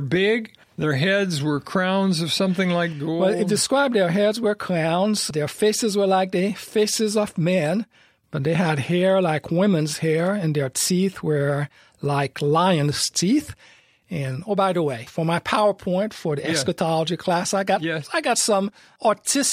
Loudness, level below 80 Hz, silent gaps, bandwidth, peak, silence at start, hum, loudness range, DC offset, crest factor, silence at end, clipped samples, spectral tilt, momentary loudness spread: -22 LUFS; -60 dBFS; none; 15.5 kHz; -4 dBFS; 0 s; none; 2 LU; under 0.1%; 18 dB; 0 s; under 0.1%; -4.5 dB/octave; 6 LU